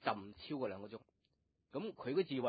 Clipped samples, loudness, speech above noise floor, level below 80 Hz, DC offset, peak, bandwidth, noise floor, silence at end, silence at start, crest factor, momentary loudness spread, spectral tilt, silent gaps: under 0.1%; -43 LUFS; 41 dB; -76 dBFS; under 0.1%; -20 dBFS; 4.9 kHz; -82 dBFS; 0 s; 0 s; 22 dB; 13 LU; -4.5 dB/octave; none